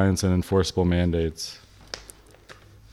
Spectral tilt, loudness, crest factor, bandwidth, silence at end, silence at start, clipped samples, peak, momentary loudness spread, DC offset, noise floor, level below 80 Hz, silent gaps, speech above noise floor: -6 dB/octave; -24 LUFS; 16 dB; 13.5 kHz; 0.4 s; 0 s; under 0.1%; -8 dBFS; 17 LU; under 0.1%; -49 dBFS; -42 dBFS; none; 27 dB